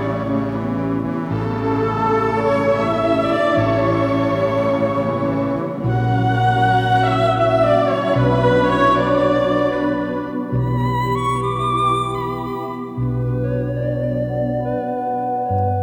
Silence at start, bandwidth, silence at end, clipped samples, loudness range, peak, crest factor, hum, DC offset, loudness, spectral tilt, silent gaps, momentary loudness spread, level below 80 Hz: 0 s; 15.5 kHz; 0 s; under 0.1%; 5 LU; -4 dBFS; 14 dB; none; under 0.1%; -18 LUFS; -8 dB/octave; none; 7 LU; -40 dBFS